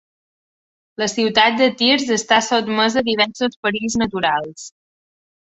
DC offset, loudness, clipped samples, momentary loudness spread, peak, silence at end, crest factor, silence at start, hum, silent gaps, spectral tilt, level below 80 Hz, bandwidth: under 0.1%; -17 LUFS; under 0.1%; 9 LU; 0 dBFS; 0.75 s; 18 dB; 1 s; none; 3.56-3.63 s; -2.5 dB/octave; -56 dBFS; 8.2 kHz